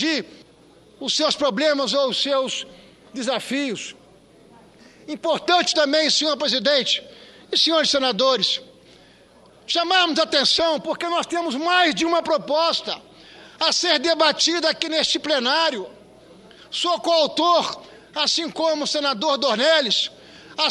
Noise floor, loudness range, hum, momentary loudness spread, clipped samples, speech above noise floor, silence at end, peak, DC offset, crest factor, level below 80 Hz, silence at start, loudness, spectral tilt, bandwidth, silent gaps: -51 dBFS; 4 LU; none; 12 LU; under 0.1%; 30 dB; 0 s; 0 dBFS; under 0.1%; 22 dB; -64 dBFS; 0 s; -20 LUFS; -2 dB/octave; 12 kHz; none